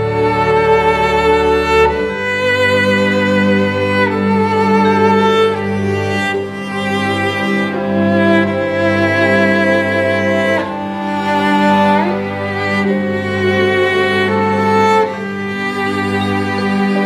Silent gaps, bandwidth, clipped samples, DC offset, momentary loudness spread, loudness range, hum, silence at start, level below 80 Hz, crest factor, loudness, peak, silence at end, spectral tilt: none; 14 kHz; under 0.1%; under 0.1%; 6 LU; 2 LU; none; 0 s; -40 dBFS; 12 dB; -14 LUFS; 0 dBFS; 0 s; -6 dB/octave